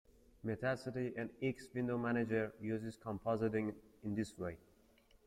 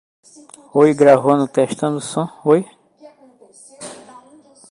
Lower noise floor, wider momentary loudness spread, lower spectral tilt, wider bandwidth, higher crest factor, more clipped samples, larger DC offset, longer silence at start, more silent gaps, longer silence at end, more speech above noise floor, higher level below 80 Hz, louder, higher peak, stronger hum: first, -69 dBFS vs -48 dBFS; second, 9 LU vs 23 LU; first, -7.5 dB/octave vs -6 dB/octave; first, 14 kHz vs 11.5 kHz; about the same, 16 dB vs 18 dB; neither; neither; second, 0.45 s vs 0.75 s; neither; about the same, 0.7 s vs 0.75 s; second, 29 dB vs 33 dB; about the same, -68 dBFS vs -64 dBFS; second, -41 LUFS vs -16 LUFS; second, -24 dBFS vs 0 dBFS; neither